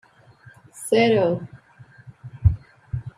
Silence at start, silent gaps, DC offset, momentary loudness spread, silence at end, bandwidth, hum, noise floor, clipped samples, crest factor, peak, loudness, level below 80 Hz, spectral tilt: 0.75 s; none; under 0.1%; 24 LU; 0.1 s; 15 kHz; none; -50 dBFS; under 0.1%; 20 dB; -4 dBFS; -22 LUFS; -38 dBFS; -6.5 dB/octave